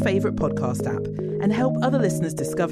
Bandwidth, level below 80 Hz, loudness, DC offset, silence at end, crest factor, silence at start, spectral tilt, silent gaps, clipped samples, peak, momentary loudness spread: 14.5 kHz; -48 dBFS; -24 LUFS; under 0.1%; 0 s; 14 dB; 0 s; -7 dB/octave; none; under 0.1%; -10 dBFS; 6 LU